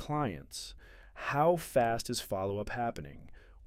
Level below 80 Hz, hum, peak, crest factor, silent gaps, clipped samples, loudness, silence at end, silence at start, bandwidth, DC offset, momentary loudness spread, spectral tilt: -54 dBFS; none; -16 dBFS; 18 dB; none; under 0.1%; -33 LUFS; 0 s; 0 s; 16 kHz; under 0.1%; 18 LU; -5 dB/octave